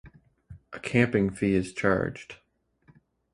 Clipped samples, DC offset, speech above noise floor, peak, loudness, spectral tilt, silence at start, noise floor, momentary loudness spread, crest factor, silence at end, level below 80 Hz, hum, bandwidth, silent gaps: under 0.1%; under 0.1%; 38 dB; -6 dBFS; -26 LUFS; -7 dB/octave; 0.05 s; -64 dBFS; 20 LU; 22 dB; 1 s; -52 dBFS; none; 11.5 kHz; none